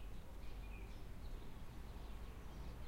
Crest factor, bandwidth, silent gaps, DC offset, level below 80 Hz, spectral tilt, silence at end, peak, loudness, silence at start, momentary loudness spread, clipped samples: 12 dB; 16 kHz; none; under 0.1%; -52 dBFS; -6 dB/octave; 0 s; -38 dBFS; -55 LUFS; 0 s; 2 LU; under 0.1%